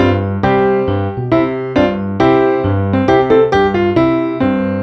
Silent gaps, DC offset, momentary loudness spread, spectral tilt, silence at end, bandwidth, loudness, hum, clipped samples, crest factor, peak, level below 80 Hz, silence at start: none; under 0.1%; 5 LU; -8.5 dB/octave; 0 s; 6.2 kHz; -13 LUFS; none; under 0.1%; 12 dB; 0 dBFS; -38 dBFS; 0 s